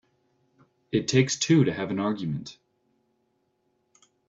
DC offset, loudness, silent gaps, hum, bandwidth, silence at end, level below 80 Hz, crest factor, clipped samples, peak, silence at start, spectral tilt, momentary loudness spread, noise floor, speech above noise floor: under 0.1%; -25 LUFS; none; none; 8 kHz; 1.75 s; -64 dBFS; 20 dB; under 0.1%; -8 dBFS; 0.95 s; -5 dB/octave; 12 LU; -73 dBFS; 48 dB